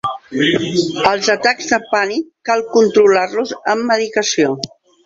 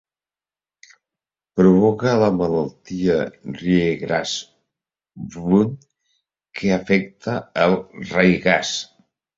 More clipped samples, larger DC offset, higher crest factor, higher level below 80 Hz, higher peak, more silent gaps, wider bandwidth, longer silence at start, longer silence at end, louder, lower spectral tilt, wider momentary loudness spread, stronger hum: neither; neither; about the same, 16 dB vs 20 dB; second, -56 dBFS vs -50 dBFS; about the same, 0 dBFS vs -2 dBFS; neither; about the same, 7.8 kHz vs 7.8 kHz; second, 0.05 s vs 1.55 s; about the same, 0.4 s vs 0.5 s; first, -15 LUFS vs -20 LUFS; second, -3.5 dB/octave vs -6 dB/octave; second, 8 LU vs 13 LU; neither